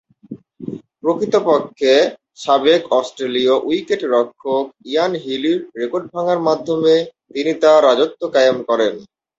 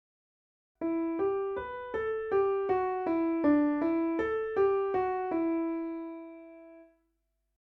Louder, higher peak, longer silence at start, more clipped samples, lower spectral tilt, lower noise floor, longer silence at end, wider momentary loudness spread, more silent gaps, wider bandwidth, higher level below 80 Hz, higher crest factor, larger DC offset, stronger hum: first, -17 LUFS vs -30 LUFS; first, -2 dBFS vs -16 dBFS; second, 0.3 s vs 0.8 s; neither; second, -4.5 dB/octave vs -8.5 dB/octave; second, -37 dBFS vs -79 dBFS; second, 0.35 s vs 0.95 s; second, 9 LU vs 12 LU; neither; first, 8 kHz vs 4.7 kHz; about the same, -62 dBFS vs -62 dBFS; about the same, 16 dB vs 16 dB; neither; neither